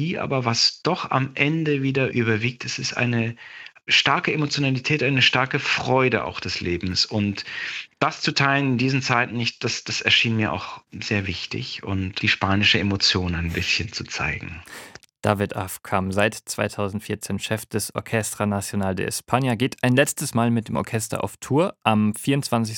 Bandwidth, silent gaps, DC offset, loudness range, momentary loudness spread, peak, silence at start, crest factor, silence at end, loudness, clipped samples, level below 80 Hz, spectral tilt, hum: 17.5 kHz; none; under 0.1%; 5 LU; 11 LU; -2 dBFS; 0 s; 22 dB; 0 s; -22 LUFS; under 0.1%; -54 dBFS; -4.5 dB/octave; none